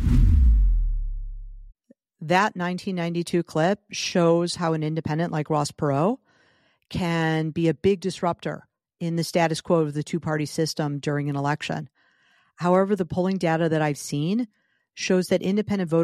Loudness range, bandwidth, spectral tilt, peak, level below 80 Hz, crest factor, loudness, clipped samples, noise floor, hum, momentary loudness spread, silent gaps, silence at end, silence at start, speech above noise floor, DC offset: 2 LU; 14 kHz; -6 dB/octave; -6 dBFS; -30 dBFS; 18 dB; -24 LUFS; under 0.1%; -63 dBFS; none; 11 LU; none; 0 s; 0 s; 40 dB; under 0.1%